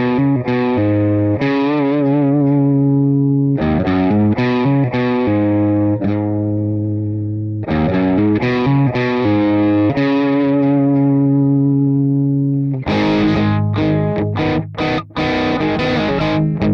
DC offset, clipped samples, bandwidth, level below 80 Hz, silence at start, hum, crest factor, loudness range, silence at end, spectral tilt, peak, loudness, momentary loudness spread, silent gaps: under 0.1%; under 0.1%; 6.4 kHz; -40 dBFS; 0 s; none; 8 dB; 3 LU; 0 s; -9 dB/octave; -6 dBFS; -15 LUFS; 5 LU; none